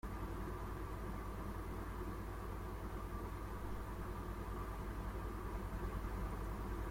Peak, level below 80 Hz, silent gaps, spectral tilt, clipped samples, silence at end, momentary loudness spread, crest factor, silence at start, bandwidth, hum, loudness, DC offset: -32 dBFS; -46 dBFS; none; -7 dB/octave; under 0.1%; 0 s; 2 LU; 12 dB; 0.05 s; 16.5 kHz; none; -47 LUFS; under 0.1%